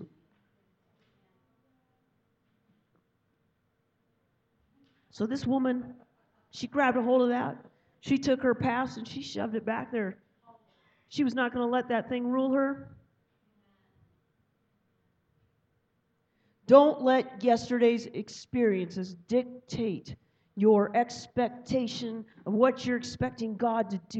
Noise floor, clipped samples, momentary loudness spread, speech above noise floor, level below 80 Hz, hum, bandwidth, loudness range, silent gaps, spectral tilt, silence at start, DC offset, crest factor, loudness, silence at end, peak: -75 dBFS; under 0.1%; 15 LU; 47 dB; -66 dBFS; none; 8.2 kHz; 10 LU; none; -6 dB/octave; 0 s; under 0.1%; 24 dB; -28 LUFS; 0 s; -6 dBFS